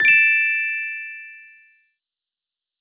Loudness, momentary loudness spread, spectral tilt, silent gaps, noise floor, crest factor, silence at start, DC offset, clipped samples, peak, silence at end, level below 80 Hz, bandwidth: -17 LUFS; 23 LU; 2 dB/octave; none; -87 dBFS; 18 dB; 0 s; under 0.1%; under 0.1%; -4 dBFS; 1.4 s; -72 dBFS; 4 kHz